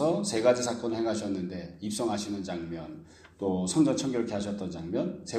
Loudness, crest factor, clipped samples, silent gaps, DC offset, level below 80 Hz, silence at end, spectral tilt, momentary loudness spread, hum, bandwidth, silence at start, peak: -30 LUFS; 20 dB; under 0.1%; none; under 0.1%; -62 dBFS; 0 s; -5 dB/octave; 12 LU; none; 14 kHz; 0 s; -10 dBFS